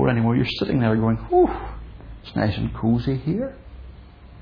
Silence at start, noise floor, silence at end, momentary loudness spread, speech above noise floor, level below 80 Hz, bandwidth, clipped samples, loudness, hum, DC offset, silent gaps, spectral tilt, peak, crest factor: 0 s; -43 dBFS; 0 s; 21 LU; 22 dB; -38 dBFS; 5.4 kHz; under 0.1%; -22 LUFS; none; under 0.1%; none; -9.5 dB/octave; -6 dBFS; 18 dB